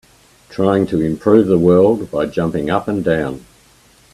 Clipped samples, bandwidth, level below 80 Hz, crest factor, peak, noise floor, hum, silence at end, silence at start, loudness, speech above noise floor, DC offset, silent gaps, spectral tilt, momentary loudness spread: under 0.1%; 13 kHz; -46 dBFS; 16 dB; 0 dBFS; -49 dBFS; none; 0.75 s; 0.5 s; -15 LUFS; 35 dB; under 0.1%; none; -8 dB/octave; 9 LU